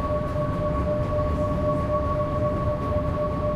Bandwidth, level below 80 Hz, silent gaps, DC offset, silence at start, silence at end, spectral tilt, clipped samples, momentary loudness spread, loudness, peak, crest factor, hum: 12 kHz; -32 dBFS; none; under 0.1%; 0 s; 0 s; -9 dB/octave; under 0.1%; 2 LU; -25 LUFS; -12 dBFS; 12 dB; none